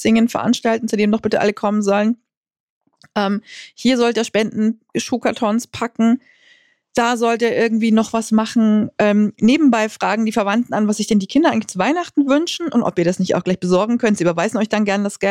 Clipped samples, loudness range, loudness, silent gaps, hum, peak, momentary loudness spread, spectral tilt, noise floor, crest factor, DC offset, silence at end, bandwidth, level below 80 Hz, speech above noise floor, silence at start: under 0.1%; 4 LU; -17 LUFS; 2.37-2.43 s, 2.60-2.81 s; none; -6 dBFS; 5 LU; -5.5 dB/octave; -54 dBFS; 12 dB; under 0.1%; 0 s; 13 kHz; -58 dBFS; 37 dB; 0 s